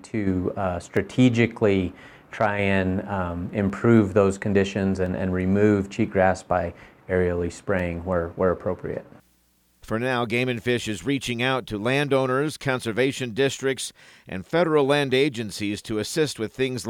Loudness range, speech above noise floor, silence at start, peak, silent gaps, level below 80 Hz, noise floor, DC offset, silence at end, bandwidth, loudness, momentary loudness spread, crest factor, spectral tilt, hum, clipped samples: 5 LU; 40 dB; 0.05 s; -4 dBFS; none; -54 dBFS; -63 dBFS; under 0.1%; 0 s; 16.5 kHz; -24 LUFS; 8 LU; 18 dB; -6 dB/octave; none; under 0.1%